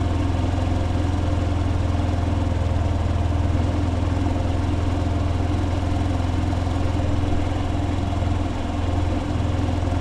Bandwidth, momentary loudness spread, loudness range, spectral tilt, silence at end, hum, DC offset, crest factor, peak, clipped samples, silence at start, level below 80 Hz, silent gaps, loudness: 9.6 kHz; 1 LU; 1 LU; -7.5 dB/octave; 0 s; none; under 0.1%; 12 dB; -10 dBFS; under 0.1%; 0 s; -30 dBFS; none; -23 LUFS